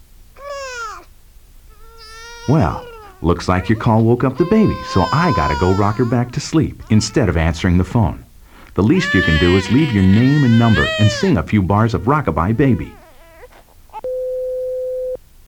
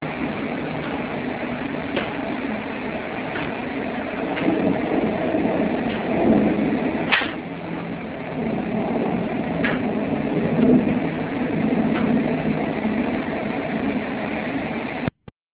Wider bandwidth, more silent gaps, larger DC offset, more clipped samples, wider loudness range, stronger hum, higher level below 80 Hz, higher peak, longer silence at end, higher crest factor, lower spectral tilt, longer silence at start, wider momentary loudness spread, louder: first, 17 kHz vs 4 kHz; neither; neither; neither; about the same, 7 LU vs 5 LU; neither; first, -32 dBFS vs -46 dBFS; about the same, 0 dBFS vs -2 dBFS; second, 0.3 s vs 0.45 s; about the same, 16 dB vs 20 dB; second, -6.5 dB/octave vs -10.5 dB/octave; first, 0.2 s vs 0 s; first, 15 LU vs 8 LU; first, -16 LUFS vs -23 LUFS